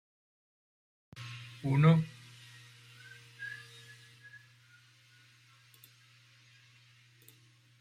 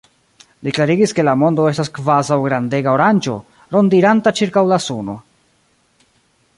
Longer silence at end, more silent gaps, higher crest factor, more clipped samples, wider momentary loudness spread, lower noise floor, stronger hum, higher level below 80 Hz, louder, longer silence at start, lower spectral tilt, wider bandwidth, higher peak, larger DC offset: first, 4.25 s vs 1.4 s; neither; first, 24 dB vs 16 dB; neither; first, 28 LU vs 12 LU; first, -63 dBFS vs -59 dBFS; neither; second, -72 dBFS vs -58 dBFS; second, -31 LUFS vs -15 LUFS; first, 1.15 s vs 0.6 s; first, -7.5 dB/octave vs -6 dB/octave; first, 14 kHz vs 11.5 kHz; second, -12 dBFS vs -2 dBFS; neither